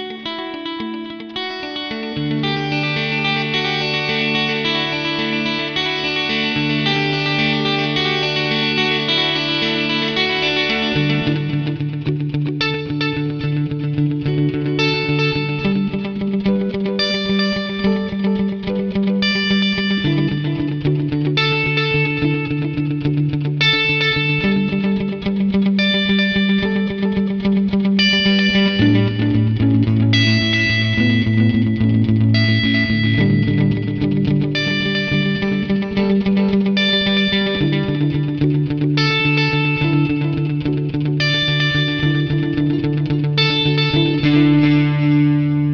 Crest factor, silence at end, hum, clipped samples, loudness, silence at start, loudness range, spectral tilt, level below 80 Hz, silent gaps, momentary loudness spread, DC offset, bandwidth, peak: 14 dB; 0 s; none; under 0.1%; -17 LUFS; 0 s; 4 LU; -6.5 dB/octave; -42 dBFS; none; 6 LU; 0.2%; 6.8 kHz; -2 dBFS